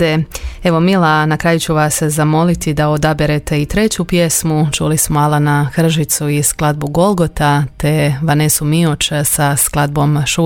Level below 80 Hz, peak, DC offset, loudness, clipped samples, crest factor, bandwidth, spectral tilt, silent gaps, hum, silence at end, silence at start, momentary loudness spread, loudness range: -32 dBFS; 0 dBFS; under 0.1%; -13 LUFS; under 0.1%; 14 dB; 17 kHz; -5 dB/octave; none; none; 0 s; 0 s; 3 LU; 1 LU